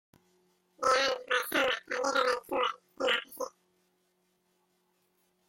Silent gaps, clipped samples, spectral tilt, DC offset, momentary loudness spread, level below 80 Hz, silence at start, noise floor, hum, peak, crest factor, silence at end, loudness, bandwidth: none; under 0.1%; -1 dB/octave; under 0.1%; 7 LU; -74 dBFS; 0.8 s; -75 dBFS; none; -14 dBFS; 20 dB; 2 s; -30 LUFS; 16.5 kHz